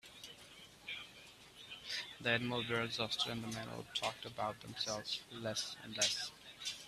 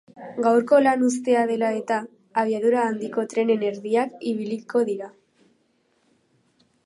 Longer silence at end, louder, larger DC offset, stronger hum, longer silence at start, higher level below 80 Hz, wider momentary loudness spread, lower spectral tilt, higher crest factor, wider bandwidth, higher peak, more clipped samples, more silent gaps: second, 0 s vs 1.75 s; second, -40 LUFS vs -23 LUFS; neither; neither; about the same, 0.05 s vs 0.15 s; first, -72 dBFS vs -78 dBFS; first, 17 LU vs 11 LU; second, -2.5 dB/octave vs -5 dB/octave; first, 24 dB vs 18 dB; first, 15 kHz vs 11.5 kHz; second, -18 dBFS vs -6 dBFS; neither; neither